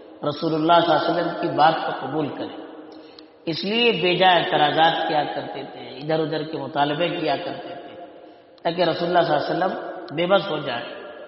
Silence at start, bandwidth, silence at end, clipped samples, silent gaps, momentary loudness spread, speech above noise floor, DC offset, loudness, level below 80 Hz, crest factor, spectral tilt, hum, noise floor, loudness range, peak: 0 s; 5.8 kHz; 0 s; under 0.1%; none; 17 LU; 25 dB; under 0.1%; -21 LUFS; -68 dBFS; 18 dB; -2.5 dB/octave; none; -46 dBFS; 5 LU; -4 dBFS